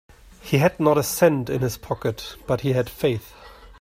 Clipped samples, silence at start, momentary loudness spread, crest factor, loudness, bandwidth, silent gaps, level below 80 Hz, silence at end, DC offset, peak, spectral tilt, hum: under 0.1%; 0.45 s; 10 LU; 20 dB; -22 LUFS; 16 kHz; none; -48 dBFS; 0.05 s; under 0.1%; -2 dBFS; -5.5 dB/octave; none